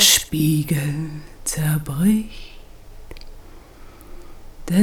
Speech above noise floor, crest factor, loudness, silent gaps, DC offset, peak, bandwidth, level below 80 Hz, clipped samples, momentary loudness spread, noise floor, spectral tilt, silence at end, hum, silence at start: 21 dB; 20 dB; -20 LUFS; none; under 0.1%; -2 dBFS; over 20 kHz; -40 dBFS; under 0.1%; 25 LU; -41 dBFS; -3.5 dB/octave; 0 s; none; 0 s